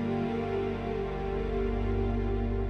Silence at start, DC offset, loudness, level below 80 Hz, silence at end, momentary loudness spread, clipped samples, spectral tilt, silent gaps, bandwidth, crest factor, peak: 0 s; under 0.1%; -32 LUFS; -36 dBFS; 0 s; 3 LU; under 0.1%; -9 dB/octave; none; 6.2 kHz; 12 dB; -18 dBFS